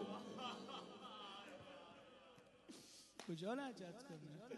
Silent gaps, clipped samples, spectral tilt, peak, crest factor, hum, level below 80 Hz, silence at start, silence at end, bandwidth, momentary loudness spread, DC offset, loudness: none; under 0.1%; -4.5 dB/octave; -34 dBFS; 18 dB; none; -88 dBFS; 0 s; 0 s; 12 kHz; 16 LU; under 0.1%; -53 LUFS